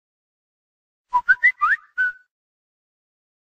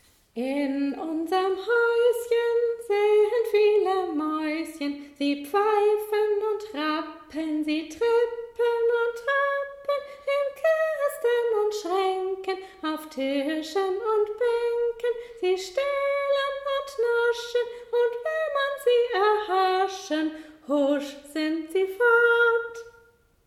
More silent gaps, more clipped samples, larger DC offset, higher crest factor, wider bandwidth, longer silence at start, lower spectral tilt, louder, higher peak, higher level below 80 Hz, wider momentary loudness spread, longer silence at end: neither; neither; neither; about the same, 20 dB vs 16 dB; second, 8.6 kHz vs 15 kHz; first, 1.15 s vs 0.35 s; second, -0.5 dB/octave vs -3 dB/octave; first, -19 LUFS vs -25 LUFS; first, -6 dBFS vs -10 dBFS; about the same, -62 dBFS vs -66 dBFS; about the same, 8 LU vs 9 LU; first, 1.45 s vs 0.55 s